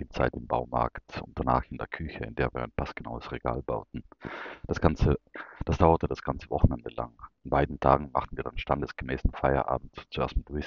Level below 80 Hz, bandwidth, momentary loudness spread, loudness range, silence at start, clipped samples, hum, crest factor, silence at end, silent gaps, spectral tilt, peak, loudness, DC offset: -38 dBFS; 7 kHz; 14 LU; 5 LU; 0 s; under 0.1%; none; 24 dB; 0 s; none; -6.5 dB/octave; -4 dBFS; -30 LUFS; under 0.1%